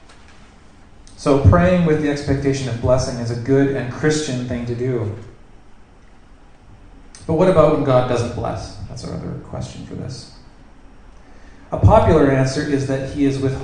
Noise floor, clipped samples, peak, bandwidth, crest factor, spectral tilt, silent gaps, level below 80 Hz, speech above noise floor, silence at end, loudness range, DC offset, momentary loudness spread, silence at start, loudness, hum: -44 dBFS; under 0.1%; 0 dBFS; 10 kHz; 18 dB; -7 dB/octave; none; -34 dBFS; 27 dB; 0 s; 10 LU; under 0.1%; 17 LU; 0.05 s; -18 LUFS; none